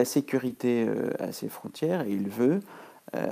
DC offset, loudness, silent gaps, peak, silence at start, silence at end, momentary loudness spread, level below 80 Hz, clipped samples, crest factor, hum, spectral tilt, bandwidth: under 0.1%; -29 LUFS; none; -10 dBFS; 0 s; 0 s; 12 LU; -78 dBFS; under 0.1%; 18 dB; none; -6 dB/octave; 15.5 kHz